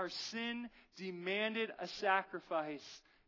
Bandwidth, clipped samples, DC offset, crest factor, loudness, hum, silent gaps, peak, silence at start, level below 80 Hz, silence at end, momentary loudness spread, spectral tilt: 6 kHz; under 0.1%; under 0.1%; 20 dB; -39 LUFS; none; none; -20 dBFS; 0 s; -78 dBFS; 0.3 s; 14 LU; -3.5 dB/octave